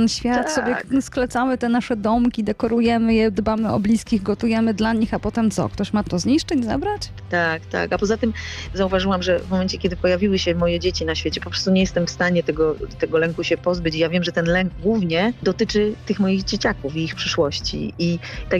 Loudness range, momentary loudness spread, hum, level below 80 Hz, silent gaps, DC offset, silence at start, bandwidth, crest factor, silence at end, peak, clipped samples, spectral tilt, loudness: 2 LU; 5 LU; none; -38 dBFS; none; under 0.1%; 0 s; 12 kHz; 12 dB; 0 s; -8 dBFS; under 0.1%; -5.5 dB/octave; -21 LUFS